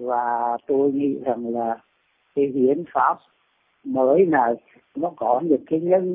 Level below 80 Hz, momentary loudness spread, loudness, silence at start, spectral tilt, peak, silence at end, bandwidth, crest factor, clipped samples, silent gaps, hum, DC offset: -68 dBFS; 12 LU; -22 LUFS; 0 s; -11.5 dB/octave; -6 dBFS; 0 s; 3.6 kHz; 16 dB; under 0.1%; none; none; under 0.1%